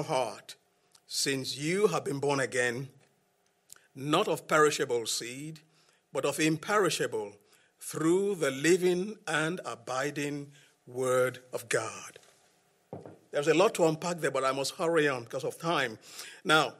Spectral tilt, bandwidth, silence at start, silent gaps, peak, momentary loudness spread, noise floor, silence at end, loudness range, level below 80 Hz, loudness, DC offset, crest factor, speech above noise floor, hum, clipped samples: -4 dB/octave; 16 kHz; 0 s; none; -12 dBFS; 18 LU; -72 dBFS; 0.05 s; 4 LU; -78 dBFS; -30 LUFS; under 0.1%; 20 dB; 42 dB; none; under 0.1%